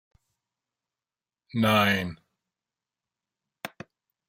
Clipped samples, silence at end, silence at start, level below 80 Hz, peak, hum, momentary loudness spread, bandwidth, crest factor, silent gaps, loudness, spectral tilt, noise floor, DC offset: under 0.1%; 0.6 s; 1.55 s; -68 dBFS; -8 dBFS; none; 20 LU; 16 kHz; 22 dB; none; -24 LUFS; -5.5 dB/octave; under -90 dBFS; under 0.1%